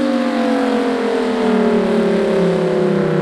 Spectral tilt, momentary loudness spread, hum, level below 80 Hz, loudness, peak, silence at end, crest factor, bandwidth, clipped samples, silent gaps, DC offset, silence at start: -7 dB/octave; 2 LU; none; -50 dBFS; -16 LUFS; -4 dBFS; 0 s; 12 dB; 12 kHz; under 0.1%; none; under 0.1%; 0 s